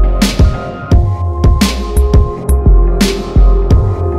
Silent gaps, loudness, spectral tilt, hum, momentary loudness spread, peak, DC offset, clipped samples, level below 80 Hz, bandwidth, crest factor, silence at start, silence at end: none; -12 LUFS; -6 dB/octave; none; 3 LU; 0 dBFS; under 0.1%; under 0.1%; -10 dBFS; 14 kHz; 10 dB; 0 s; 0 s